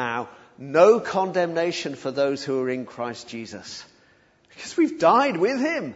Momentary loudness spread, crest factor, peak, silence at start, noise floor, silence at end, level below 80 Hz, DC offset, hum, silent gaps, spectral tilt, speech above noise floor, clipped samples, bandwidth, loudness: 19 LU; 20 dB; -2 dBFS; 0 s; -59 dBFS; 0 s; -68 dBFS; under 0.1%; none; none; -5 dB/octave; 36 dB; under 0.1%; 8 kHz; -22 LUFS